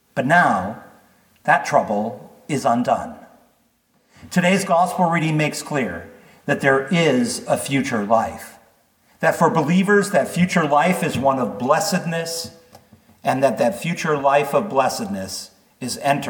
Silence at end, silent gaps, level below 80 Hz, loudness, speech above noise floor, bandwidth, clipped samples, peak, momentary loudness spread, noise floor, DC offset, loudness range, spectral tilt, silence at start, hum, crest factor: 0 s; none; -60 dBFS; -19 LUFS; 43 dB; 19 kHz; under 0.1%; -2 dBFS; 12 LU; -62 dBFS; under 0.1%; 3 LU; -5 dB/octave; 0.15 s; none; 18 dB